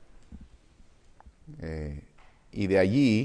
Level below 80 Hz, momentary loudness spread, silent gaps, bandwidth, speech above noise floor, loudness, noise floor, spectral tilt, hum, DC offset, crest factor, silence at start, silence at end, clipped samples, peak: -48 dBFS; 22 LU; none; 10.5 kHz; 31 dB; -27 LUFS; -56 dBFS; -7.5 dB/octave; none; under 0.1%; 18 dB; 0 s; 0 s; under 0.1%; -12 dBFS